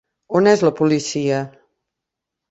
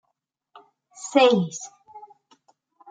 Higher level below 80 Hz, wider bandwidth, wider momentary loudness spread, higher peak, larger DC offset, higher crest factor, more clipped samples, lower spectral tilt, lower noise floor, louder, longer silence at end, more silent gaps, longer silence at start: first, -60 dBFS vs -76 dBFS; second, 8.2 kHz vs 9.4 kHz; second, 9 LU vs 21 LU; about the same, -2 dBFS vs -4 dBFS; neither; about the same, 18 dB vs 22 dB; neither; about the same, -5.5 dB/octave vs -4.5 dB/octave; first, -83 dBFS vs -78 dBFS; about the same, -18 LUFS vs -20 LUFS; first, 1.05 s vs 0.9 s; neither; second, 0.3 s vs 1 s